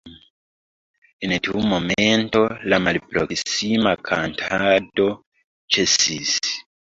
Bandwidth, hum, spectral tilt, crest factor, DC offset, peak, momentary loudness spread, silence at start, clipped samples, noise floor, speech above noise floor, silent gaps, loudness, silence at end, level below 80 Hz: 8 kHz; none; -3 dB/octave; 18 dB; under 0.1%; -2 dBFS; 6 LU; 0.05 s; under 0.1%; under -90 dBFS; over 70 dB; 0.30-1.02 s, 1.13-1.19 s, 5.26-5.32 s, 5.44-5.68 s; -20 LUFS; 0.3 s; -50 dBFS